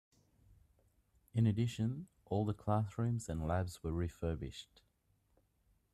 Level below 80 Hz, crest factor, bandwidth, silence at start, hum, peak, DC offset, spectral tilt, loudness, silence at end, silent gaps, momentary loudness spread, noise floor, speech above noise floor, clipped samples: -58 dBFS; 20 dB; 13.5 kHz; 1.35 s; none; -20 dBFS; under 0.1%; -7.5 dB/octave; -38 LUFS; 1.3 s; none; 9 LU; -76 dBFS; 40 dB; under 0.1%